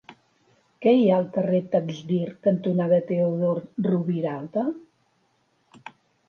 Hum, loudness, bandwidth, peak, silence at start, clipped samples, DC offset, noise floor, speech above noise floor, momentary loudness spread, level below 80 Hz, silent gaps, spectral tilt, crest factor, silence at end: none; -24 LUFS; 6.8 kHz; -8 dBFS; 0.1 s; under 0.1%; under 0.1%; -68 dBFS; 45 dB; 9 LU; -72 dBFS; none; -9 dB/octave; 16 dB; 0.4 s